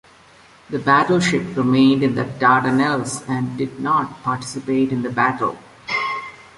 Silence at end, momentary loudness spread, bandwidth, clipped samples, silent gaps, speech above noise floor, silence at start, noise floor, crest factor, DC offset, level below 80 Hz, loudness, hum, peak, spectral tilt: 0.15 s; 10 LU; 11.5 kHz; under 0.1%; none; 30 dB; 0.7 s; -48 dBFS; 18 dB; under 0.1%; -56 dBFS; -19 LUFS; none; -2 dBFS; -5.5 dB/octave